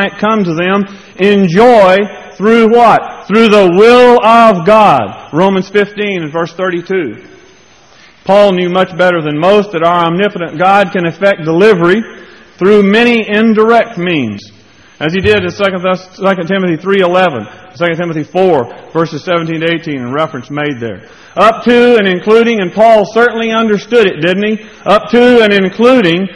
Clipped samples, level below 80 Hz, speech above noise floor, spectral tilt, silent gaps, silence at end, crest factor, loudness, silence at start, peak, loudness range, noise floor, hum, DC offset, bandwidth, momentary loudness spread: 1%; -46 dBFS; 33 dB; -6.5 dB/octave; none; 0 s; 10 dB; -9 LUFS; 0 s; 0 dBFS; 7 LU; -42 dBFS; none; 0.2%; 11 kHz; 11 LU